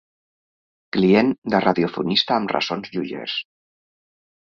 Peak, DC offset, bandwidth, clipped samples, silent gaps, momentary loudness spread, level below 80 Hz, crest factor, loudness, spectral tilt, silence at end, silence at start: -2 dBFS; under 0.1%; 7 kHz; under 0.1%; 1.38-1.42 s; 11 LU; -60 dBFS; 20 dB; -21 LUFS; -6 dB/octave; 1.1 s; 0.95 s